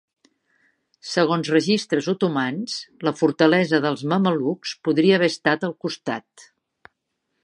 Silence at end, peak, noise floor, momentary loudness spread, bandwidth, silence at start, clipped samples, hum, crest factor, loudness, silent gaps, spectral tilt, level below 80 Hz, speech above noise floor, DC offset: 1 s; -2 dBFS; -76 dBFS; 11 LU; 11 kHz; 1.05 s; under 0.1%; none; 20 dB; -21 LUFS; none; -5.5 dB/octave; -72 dBFS; 55 dB; under 0.1%